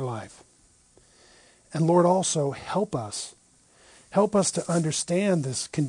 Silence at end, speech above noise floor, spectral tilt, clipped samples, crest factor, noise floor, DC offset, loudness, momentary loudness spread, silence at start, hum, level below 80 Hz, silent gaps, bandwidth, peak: 0 s; 35 dB; -5 dB/octave; under 0.1%; 18 dB; -59 dBFS; under 0.1%; -25 LUFS; 14 LU; 0 s; none; -64 dBFS; none; 10.5 kHz; -8 dBFS